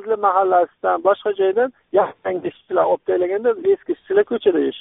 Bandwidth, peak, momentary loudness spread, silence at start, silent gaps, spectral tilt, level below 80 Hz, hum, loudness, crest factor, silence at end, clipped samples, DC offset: 3.9 kHz; -4 dBFS; 5 LU; 0 s; none; -3.5 dB/octave; -64 dBFS; none; -19 LUFS; 16 dB; 0 s; under 0.1%; under 0.1%